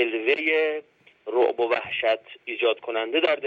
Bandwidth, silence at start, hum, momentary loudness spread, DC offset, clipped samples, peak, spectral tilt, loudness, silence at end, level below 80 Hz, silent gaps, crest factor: 6.6 kHz; 0 s; none; 8 LU; under 0.1%; under 0.1%; -8 dBFS; -4.5 dB/octave; -24 LUFS; 0 s; -74 dBFS; none; 16 dB